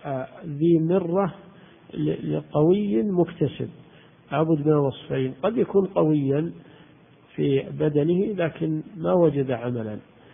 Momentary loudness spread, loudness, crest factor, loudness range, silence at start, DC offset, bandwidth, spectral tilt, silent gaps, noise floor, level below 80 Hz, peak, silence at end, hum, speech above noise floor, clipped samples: 11 LU; -24 LUFS; 16 dB; 1 LU; 0.05 s; under 0.1%; 3.7 kHz; -12.5 dB/octave; none; -53 dBFS; -58 dBFS; -8 dBFS; 0.35 s; none; 30 dB; under 0.1%